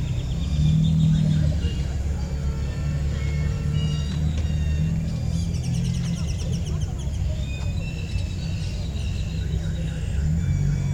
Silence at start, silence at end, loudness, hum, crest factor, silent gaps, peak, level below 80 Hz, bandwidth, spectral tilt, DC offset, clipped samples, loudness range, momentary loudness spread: 0 s; 0 s; -25 LUFS; none; 14 dB; none; -10 dBFS; -28 dBFS; 10.5 kHz; -7 dB/octave; under 0.1%; under 0.1%; 5 LU; 8 LU